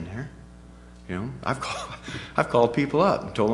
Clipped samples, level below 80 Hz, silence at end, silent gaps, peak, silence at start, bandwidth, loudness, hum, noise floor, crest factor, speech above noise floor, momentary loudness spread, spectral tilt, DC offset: under 0.1%; -50 dBFS; 0 s; none; -4 dBFS; 0 s; 11.5 kHz; -26 LUFS; none; -46 dBFS; 22 dB; 22 dB; 15 LU; -6 dB/octave; under 0.1%